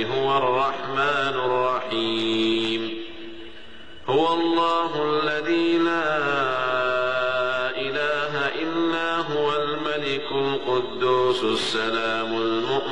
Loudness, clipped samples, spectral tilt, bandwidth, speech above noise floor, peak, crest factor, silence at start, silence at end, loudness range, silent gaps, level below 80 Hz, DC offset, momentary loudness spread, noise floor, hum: -23 LUFS; under 0.1%; -5 dB/octave; 11 kHz; 21 dB; -10 dBFS; 12 dB; 0 s; 0 s; 2 LU; none; -58 dBFS; 1%; 5 LU; -44 dBFS; none